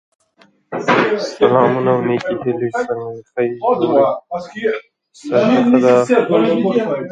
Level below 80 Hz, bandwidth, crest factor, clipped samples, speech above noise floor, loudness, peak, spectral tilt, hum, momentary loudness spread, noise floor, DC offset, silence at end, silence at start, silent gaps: -60 dBFS; 9 kHz; 16 dB; under 0.1%; 38 dB; -16 LUFS; 0 dBFS; -6.5 dB/octave; none; 12 LU; -54 dBFS; under 0.1%; 0 s; 0.7 s; none